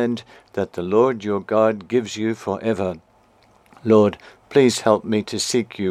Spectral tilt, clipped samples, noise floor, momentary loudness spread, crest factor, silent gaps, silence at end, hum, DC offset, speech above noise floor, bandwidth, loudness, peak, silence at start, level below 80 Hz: -5 dB/octave; under 0.1%; -55 dBFS; 11 LU; 18 dB; none; 0 s; none; under 0.1%; 36 dB; 14.5 kHz; -20 LUFS; -2 dBFS; 0 s; -62 dBFS